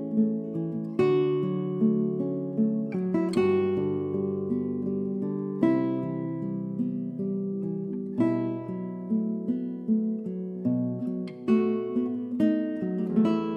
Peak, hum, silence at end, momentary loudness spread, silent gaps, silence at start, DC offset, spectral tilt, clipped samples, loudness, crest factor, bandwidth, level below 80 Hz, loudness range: -10 dBFS; none; 0 s; 7 LU; none; 0 s; under 0.1%; -9.5 dB/octave; under 0.1%; -28 LUFS; 16 dB; 9 kHz; -70 dBFS; 4 LU